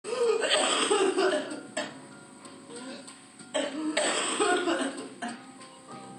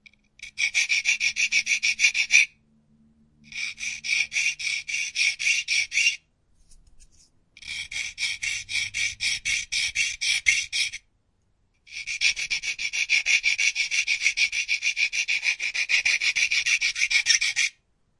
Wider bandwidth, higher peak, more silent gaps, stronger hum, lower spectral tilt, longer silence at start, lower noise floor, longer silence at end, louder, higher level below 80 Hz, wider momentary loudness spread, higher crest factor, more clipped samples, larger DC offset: about the same, 11.5 kHz vs 11.5 kHz; second, -12 dBFS vs -2 dBFS; neither; neither; first, -1.5 dB/octave vs 3.5 dB/octave; second, 0.05 s vs 0.4 s; second, -48 dBFS vs -68 dBFS; second, 0 s vs 0.5 s; second, -28 LUFS vs -22 LUFS; second, -86 dBFS vs -60 dBFS; first, 23 LU vs 11 LU; second, 18 dB vs 24 dB; neither; neither